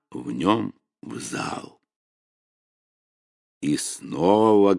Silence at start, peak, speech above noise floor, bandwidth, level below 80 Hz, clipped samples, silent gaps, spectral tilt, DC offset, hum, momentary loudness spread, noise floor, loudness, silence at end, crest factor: 0.1 s; -4 dBFS; over 68 dB; 11.5 kHz; -64 dBFS; under 0.1%; 1.96-3.61 s; -5 dB/octave; under 0.1%; none; 17 LU; under -90 dBFS; -23 LUFS; 0 s; 20 dB